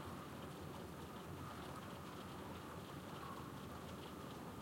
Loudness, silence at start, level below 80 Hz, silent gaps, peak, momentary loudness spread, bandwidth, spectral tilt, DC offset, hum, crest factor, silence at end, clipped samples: -51 LUFS; 0 s; -70 dBFS; none; -38 dBFS; 1 LU; 16.5 kHz; -5.5 dB/octave; under 0.1%; none; 12 dB; 0 s; under 0.1%